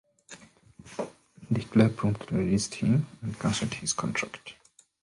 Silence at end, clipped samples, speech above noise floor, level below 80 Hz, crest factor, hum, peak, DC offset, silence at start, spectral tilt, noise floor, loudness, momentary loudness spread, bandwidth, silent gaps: 0.5 s; under 0.1%; 27 dB; -54 dBFS; 22 dB; none; -8 dBFS; under 0.1%; 0.3 s; -5.5 dB/octave; -54 dBFS; -28 LUFS; 23 LU; 11.5 kHz; none